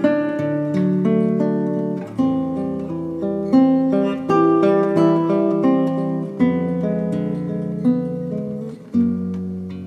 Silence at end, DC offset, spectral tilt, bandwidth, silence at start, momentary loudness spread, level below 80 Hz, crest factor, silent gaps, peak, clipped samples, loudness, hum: 0 s; under 0.1%; -9.5 dB/octave; 7.2 kHz; 0 s; 9 LU; -56 dBFS; 16 dB; none; -2 dBFS; under 0.1%; -19 LUFS; none